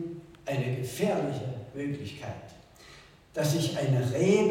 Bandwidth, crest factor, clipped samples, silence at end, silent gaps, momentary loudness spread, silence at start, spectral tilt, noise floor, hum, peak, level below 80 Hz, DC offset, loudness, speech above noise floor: 17 kHz; 18 dB; under 0.1%; 0 s; none; 20 LU; 0 s; -6 dB/octave; -53 dBFS; none; -12 dBFS; -62 dBFS; under 0.1%; -30 LUFS; 25 dB